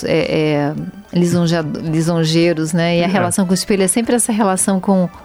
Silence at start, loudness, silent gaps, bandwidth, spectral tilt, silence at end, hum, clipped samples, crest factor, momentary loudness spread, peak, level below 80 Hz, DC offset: 0 s; -15 LUFS; none; 16 kHz; -5 dB/octave; 0 s; none; under 0.1%; 12 dB; 5 LU; -2 dBFS; -46 dBFS; under 0.1%